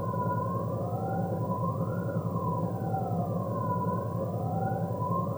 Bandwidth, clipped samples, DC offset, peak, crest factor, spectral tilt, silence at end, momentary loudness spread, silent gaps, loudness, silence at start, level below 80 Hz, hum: over 20 kHz; under 0.1%; under 0.1%; -18 dBFS; 14 dB; -10 dB/octave; 0 s; 2 LU; none; -31 LUFS; 0 s; -60 dBFS; none